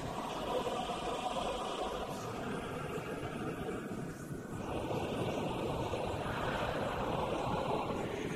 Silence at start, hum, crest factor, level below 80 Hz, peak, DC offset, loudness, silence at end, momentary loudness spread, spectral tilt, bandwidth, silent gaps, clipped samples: 0 s; none; 16 dB; -54 dBFS; -22 dBFS; under 0.1%; -38 LUFS; 0 s; 5 LU; -5.5 dB/octave; 16 kHz; none; under 0.1%